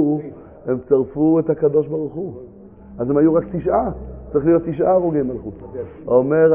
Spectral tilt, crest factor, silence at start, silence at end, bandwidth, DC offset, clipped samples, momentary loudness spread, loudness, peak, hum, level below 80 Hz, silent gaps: -13.5 dB/octave; 16 dB; 0 s; 0 s; 3.3 kHz; under 0.1%; under 0.1%; 15 LU; -19 LUFS; -2 dBFS; none; -42 dBFS; none